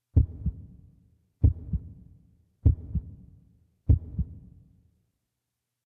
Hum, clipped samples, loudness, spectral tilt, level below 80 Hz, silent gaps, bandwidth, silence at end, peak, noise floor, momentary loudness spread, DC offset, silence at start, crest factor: none; under 0.1%; -29 LUFS; -13 dB/octave; -34 dBFS; none; 1.1 kHz; 1.5 s; -8 dBFS; -84 dBFS; 22 LU; under 0.1%; 0.15 s; 22 dB